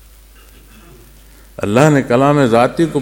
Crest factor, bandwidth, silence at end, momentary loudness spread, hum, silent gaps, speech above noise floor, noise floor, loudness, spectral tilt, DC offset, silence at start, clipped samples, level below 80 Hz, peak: 14 dB; 17 kHz; 0 s; 5 LU; none; none; 30 dB; -42 dBFS; -12 LUFS; -6.5 dB/octave; under 0.1%; 1.6 s; under 0.1%; -42 dBFS; 0 dBFS